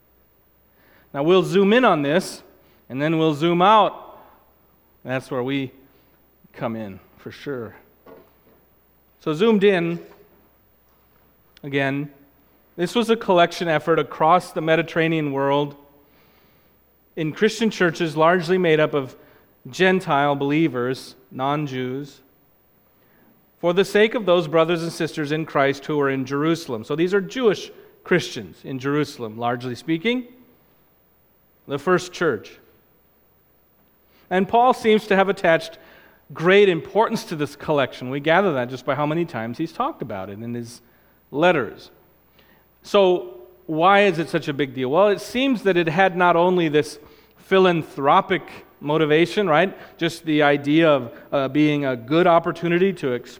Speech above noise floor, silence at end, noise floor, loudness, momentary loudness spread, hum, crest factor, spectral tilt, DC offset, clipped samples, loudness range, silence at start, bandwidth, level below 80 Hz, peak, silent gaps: 39 dB; 0.05 s; -59 dBFS; -20 LUFS; 15 LU; none; 20 dB; -6 dB/octave; under 0.1%; under 0.1%; 8 LU; 1.15 s; 16.5 kHz; -62 dBFS; -2 dBFS; none